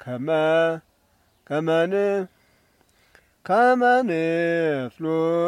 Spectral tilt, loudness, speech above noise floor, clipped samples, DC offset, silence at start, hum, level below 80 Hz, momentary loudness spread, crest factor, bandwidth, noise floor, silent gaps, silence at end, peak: -6.5 dB/octave; -22 LUFS; 42 dB; under 0.1%; under 0.1%; 0.05 s; none; -68 dBFS; 10 LU; 14 dB; 11.5 kHz; -63 dBFS; none; 0 s; -8 dBFS